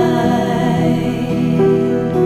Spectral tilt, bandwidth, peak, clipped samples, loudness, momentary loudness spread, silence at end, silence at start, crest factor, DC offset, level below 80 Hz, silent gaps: -7.5 dB/octave; 14 kHz; -2 dBFS; under 0.1%; -15 LUFS; 4 LU; 0 s; 0 s; 12 dB; under 0.1%; -42 dBFS; none